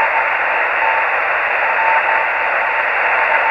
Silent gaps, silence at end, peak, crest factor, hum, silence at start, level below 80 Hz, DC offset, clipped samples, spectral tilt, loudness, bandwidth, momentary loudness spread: none; 0 s; -2 dBFS; 14 dB; none; 0 s; -56 dBFS; under 0.1%; under 0.1%; -3 dB/octave; -14 LUFS; 8.4 kHz; 2 LU